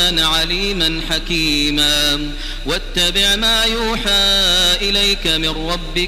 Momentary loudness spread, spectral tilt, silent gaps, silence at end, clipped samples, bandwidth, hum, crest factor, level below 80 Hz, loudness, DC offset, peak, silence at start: 9 LU; -2 dB/octave; none; 0 s; under 0.1%; 16 kHz; none; 14 dB; -26 dBFS; -14 LUFS; under 0.1%; -2 dBFS; 0 s